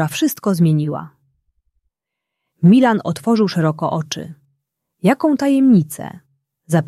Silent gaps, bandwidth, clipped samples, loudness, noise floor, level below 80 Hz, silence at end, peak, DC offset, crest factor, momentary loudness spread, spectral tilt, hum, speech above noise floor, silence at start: none; 15 kHz; under 0.1%; -16 LUFS; -81 dBFS; -62 dBFS; 0 s; -2 dBFS; under 0.1%; 16 dB; 15 LU; -6.5 dB/octave; none; 66 dB; 0 s